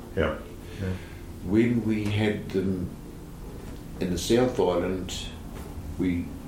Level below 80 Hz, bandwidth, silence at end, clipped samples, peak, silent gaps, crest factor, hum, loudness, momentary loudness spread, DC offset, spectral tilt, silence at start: -42 dBFS; 16.5 kHz; 0 s; under 0.1%; -10 dBFS; none; 18 dB; none; -28 LUFS; 17 LU; under 0.1%; -6 dB/octave; 0 s